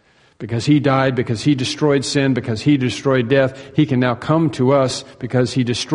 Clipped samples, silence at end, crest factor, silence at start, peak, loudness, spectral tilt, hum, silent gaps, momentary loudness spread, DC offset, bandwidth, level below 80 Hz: under 0.1%; 0 s; 16 dB; 0.4 s; 0 dBFS; -17 LUFS; -6 dB/octave; none; none; 5 LU; under 0.1%; 10.5 kHz; -52 dBFS